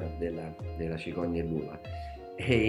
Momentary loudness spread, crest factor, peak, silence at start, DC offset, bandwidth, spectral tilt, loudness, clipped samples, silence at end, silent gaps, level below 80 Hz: 9 LU; 22 dB; -10 dBFS; 0 s; under 0.1%; 11.5 kHz; -7.5 dB/octave; -35 LUFS; under 0.1%; 0 s; none; -46 dBFS